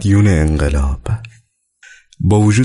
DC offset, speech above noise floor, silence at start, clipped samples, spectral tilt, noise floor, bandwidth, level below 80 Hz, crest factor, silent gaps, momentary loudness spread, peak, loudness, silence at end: under 0.1%; 41 dB; 0 s; under 0.1%; -7 dB/octave; -53 dBFS; 11.5 kHz; -22 dBFS; 12 dB; none; 11 LU; -4 dBFS; -15 LUFS; 0 s